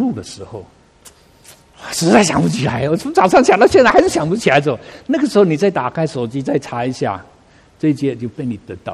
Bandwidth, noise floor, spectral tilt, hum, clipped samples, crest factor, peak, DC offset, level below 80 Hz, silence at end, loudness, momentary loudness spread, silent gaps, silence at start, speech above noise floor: 15.5 kHz; -48 dBFS; -5.5 dB/octave; none; under 0.1%; 16 dB; 0 dBFS; under 0.1%; -46 dBFS; 0 s; -15 LUFS; 17 LU; none; 0 s; 33 dB